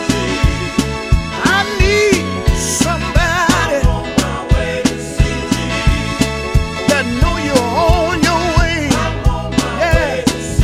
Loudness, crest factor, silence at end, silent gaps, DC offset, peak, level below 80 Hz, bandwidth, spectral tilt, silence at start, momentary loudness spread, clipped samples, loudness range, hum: -15 LUFS; 14 dB; 0 s; none; 0.1%; 0 dBFS; -20 dBFS; 16 kHz; -4.5 dB/octave; 0 s; 4 LU; under 0.1%; 2 LU; none